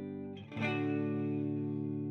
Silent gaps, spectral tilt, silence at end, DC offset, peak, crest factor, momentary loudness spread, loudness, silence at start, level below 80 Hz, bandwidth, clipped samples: none; -8.5 dB/octave; 0 s; under 0.1%; -24 dBFS; 12 dB; 9 LU; -36 LUFS; 0 s; -80 dBFS; 6.4 kHz; under 0.1%